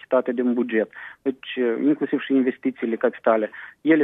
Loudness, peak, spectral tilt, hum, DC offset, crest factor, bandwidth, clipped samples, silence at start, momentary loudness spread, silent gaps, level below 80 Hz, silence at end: -23 LUFS; -6 dBFS; -8.5 dB/octave; none; under 0.1%; 16 dB; 3.9 kHz; under 0.1%; 0.1 s; 8 LU; none; -76 dBFS; 0 s